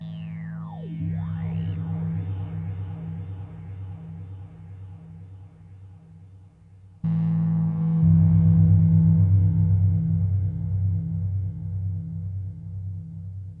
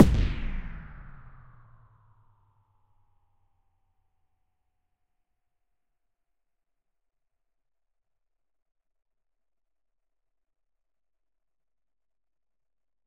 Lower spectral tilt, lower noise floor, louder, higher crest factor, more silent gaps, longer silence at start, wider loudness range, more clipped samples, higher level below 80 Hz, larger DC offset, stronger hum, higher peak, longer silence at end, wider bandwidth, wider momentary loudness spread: first, -12.5 dB/octave vs -7.5 dB/octave; second, -49 dBFS vs under -90 dBFS; first, -24 LUFS vs -28 LUFS; second, 16 dB vs 34 dB; neither; about the same, 0 s vs 0 s; second, 19 LU vs 25 LU; neither; second, -46 dBFS vs -40 dBFS; neither; neither; second, -8 dBFS vs 0 dBFS; second, 0 s vs 11.75 s; second, 3 kHz vs 6.8 kHz; second, 21 LU vs 25 LU